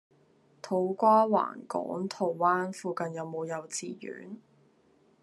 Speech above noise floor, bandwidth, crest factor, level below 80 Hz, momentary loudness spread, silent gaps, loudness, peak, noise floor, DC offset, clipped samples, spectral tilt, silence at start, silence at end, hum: 36 dB; 12.5 kHz; 20 dB; -84 dBFS; 19 LU; none; -29 LUFS; -10 dBFS; -65 dBFS; under 0.1%; under 0.1%; -5.5 dB/octave; 0.65 s; 0.85 s; none